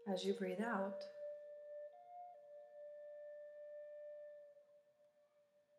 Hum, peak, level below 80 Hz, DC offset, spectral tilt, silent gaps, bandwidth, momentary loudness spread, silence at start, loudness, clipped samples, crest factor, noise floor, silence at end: none; -28 dBFS; under -90 dBFS; under 0.1%; -5.5 dB/octave; none; 14 kHz; 17 LU; 0 s; -48 LUFS; under 0.1%; 20 dB; -76 dBFS; 0 s